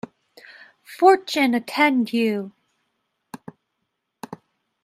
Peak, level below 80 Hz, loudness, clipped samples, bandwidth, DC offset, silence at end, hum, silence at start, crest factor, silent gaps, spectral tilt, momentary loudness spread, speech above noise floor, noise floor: -2 dBFS; -74 dBFS; -19 LUFS; under 0.1%; 15.5 kHz; under 0.1%; 0.5 s; none; 0.9 s; 22 dB; none; -4.5 dB/octave; 25 LU; 58 dB; -77 dBFS